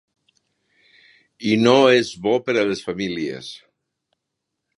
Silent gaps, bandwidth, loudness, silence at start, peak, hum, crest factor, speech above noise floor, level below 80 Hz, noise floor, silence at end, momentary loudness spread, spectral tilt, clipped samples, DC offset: none; 11 kHz; -19 LUFS; 1.4 s; 0 dBFS; none; 22 dB; 61 dB; -62 dBFS; -80 dBFS; 1.2 s; 15 LU; -5 dB/octave; under 0.1%; under 0.1%